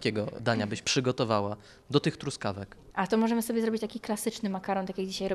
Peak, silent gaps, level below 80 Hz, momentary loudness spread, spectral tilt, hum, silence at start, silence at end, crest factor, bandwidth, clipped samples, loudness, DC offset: -10 dBFS; none; -60 dBFS; 8 LU; -5 dB/octave; none; 0 s; 0 s; 20 dB; 13.5 kHz; under 0.1%; -30 LUFS; under 0.1%